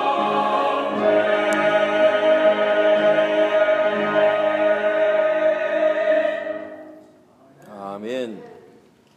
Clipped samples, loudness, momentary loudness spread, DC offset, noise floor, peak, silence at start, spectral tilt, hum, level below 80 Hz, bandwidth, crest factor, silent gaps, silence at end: under 0.1%; -19 LUFS; 13 LU; under 0.1%; -52 dBFS; -6 dBFS; 0 s; -4.5 dB/octave; none; -76 dBFS; 9.6 kHz; 14 dB; none; 0.65 s